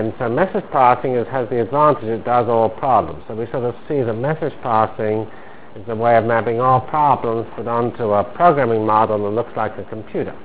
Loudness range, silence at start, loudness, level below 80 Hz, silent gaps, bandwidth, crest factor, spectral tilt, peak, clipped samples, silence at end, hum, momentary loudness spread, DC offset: 3 LU; 0 s; -18 LUFS; -48 dBFS; none; 4 kHz; 18 dB; -11 dB/octave; 0 dBFS; under 0.1%; 0 s; none; 10 LU; 2%